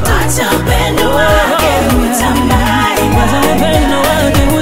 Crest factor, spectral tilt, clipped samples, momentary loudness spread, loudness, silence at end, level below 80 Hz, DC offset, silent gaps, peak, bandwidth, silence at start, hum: 10 dB; -4.5 dB/octave; under 0.1%; 2 LU; -10 LUFS; 0 s; -18 dBFS; 6%; none; 0 dBFS; 16.5 kHz; 0 s; none